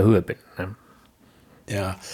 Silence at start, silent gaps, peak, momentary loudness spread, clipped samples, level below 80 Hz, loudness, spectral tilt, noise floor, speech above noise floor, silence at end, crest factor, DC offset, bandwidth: 0 s; none; -6 dBFS; 14 LU; under 0.1%; -54 dBFS; -27 LUFS; -7 dB/octave; -55 dBFS; 32 dB; 0 s; 20 dB; under 0.1%; 15.5 kHz